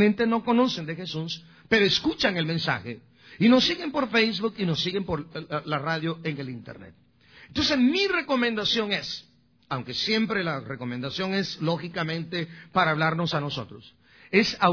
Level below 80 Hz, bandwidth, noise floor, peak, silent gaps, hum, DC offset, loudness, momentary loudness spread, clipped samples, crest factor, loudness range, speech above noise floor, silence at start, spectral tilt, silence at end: -58 dBFS; 5.4 kHz; -53 dBFS; -6 dBFS; none; none; under 0.1%; -25 LUFS; 13 LU; under 0.1%; 20 dB; 4 LU; 28 dB; 0 s; -5 dB/octave; 0 s